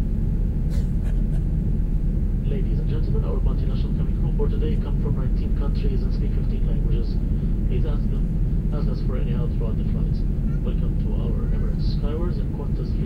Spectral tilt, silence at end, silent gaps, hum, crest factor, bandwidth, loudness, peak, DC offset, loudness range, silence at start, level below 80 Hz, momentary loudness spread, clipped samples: -10 dB/octave; 0 s; none; none; 12 dB; 5 kHz; -25 LUFS; -10 dBFS; under 0.1%; 1 LU; 0 s; -22 dBFS; 1 LU; under 0.1%